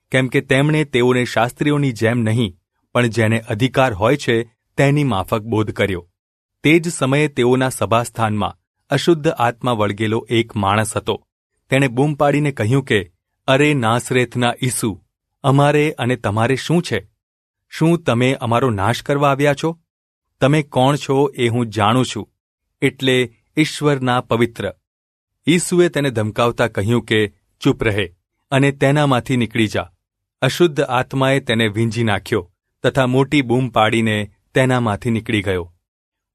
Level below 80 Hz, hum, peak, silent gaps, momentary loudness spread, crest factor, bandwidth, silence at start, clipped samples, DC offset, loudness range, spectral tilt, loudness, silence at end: -50 dBFS; none; 0 dBFS; 6.19-6.49 s, 8.67-8.74 s, 11.32-11.50 s, 17.23-17.54 s, 19.90-20.22 s, 22.40-22.58 s, 24.87-25.27 s; 7 LU; 18 dB; 14 kHz; 0.1 s; under 0.1%; under 0.1%; 1 LU; -5.5 dB/octave; -18 LUFS; 0.65 s